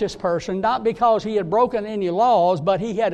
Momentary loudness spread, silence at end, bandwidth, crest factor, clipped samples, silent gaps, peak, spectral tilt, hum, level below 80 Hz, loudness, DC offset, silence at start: 6 LU; 0 s; 9.6 kHz; 14 dB; under 0.1%; none; -6 dBFS; -6.5 dB/octave; none; -52 dBFS; -20 LUFS; under 0.1%; 0 s